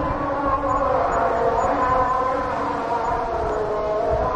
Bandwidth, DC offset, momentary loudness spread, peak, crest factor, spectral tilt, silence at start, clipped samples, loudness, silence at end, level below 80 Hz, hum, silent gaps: 10.5 kHz; under 0.1%; 4 LU; -8 dBFS; 14 dB; -6.5 dB/octave; 0 s; under 0.1%; -22 LUFS; 0 s; -36 dBFS; none; none